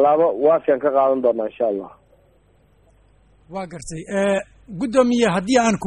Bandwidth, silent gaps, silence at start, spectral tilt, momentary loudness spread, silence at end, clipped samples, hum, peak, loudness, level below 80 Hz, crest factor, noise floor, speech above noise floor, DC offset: 11 kHz; none; 0 s; -5 dB/octave; 16 LU; 0 s; under 0.1%; none; -2 dBFS; -19 LUFS; -52 dBFS; 18 dB; -56 dBFS; 38 dB; under 0.1%